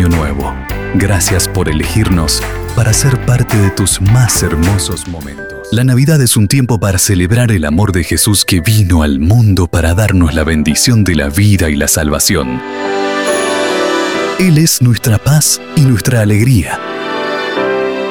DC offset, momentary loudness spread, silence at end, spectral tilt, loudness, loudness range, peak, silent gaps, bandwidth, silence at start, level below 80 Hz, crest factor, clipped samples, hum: under 0.1%; 8 LU; 0 s; -4.5 dB/octave; -11 LUFS; 2 LU; 0 dBFS; none; over 20 kHz; 0 s; -24 dBFS; 10 dB; under 0.1%; none